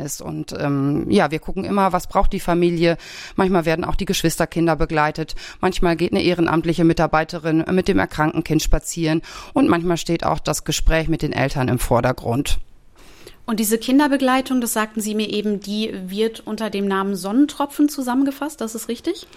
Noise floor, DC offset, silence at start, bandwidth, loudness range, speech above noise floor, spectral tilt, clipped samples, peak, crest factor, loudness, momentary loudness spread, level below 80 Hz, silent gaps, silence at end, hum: -44 dBFS; under 0.1%; 0 s; 16 kHz; 3 LU; 25 dB; -5 dB/octave; under 0.1%; -2 dBFS; 18 dB; -20 LUFS; 8 LU; -30 dBFS; none; 0.15 s; none